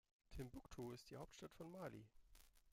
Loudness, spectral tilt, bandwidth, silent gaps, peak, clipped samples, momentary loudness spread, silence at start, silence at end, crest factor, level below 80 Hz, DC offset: -57 LUFS; -5.5 dB/octave; 16.5 kHz; none; -38 dBFS; under 0.1%; 4 LU; 0.3 s; 0 s; 18 dB; -68 dBFS; under 0.1%